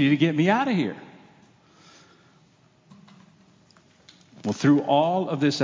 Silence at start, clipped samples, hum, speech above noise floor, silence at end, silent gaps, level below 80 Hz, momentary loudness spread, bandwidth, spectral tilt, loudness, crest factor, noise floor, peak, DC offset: 0 s; under 0.1%; none; 38 dB; 0 s; none; -72 dBFS; 11 LU; 7.6 kHz; -6.5 dB/octave; -23 LUFS; 18 dB; -59 dBFS; -6 dBFS; under 0.1%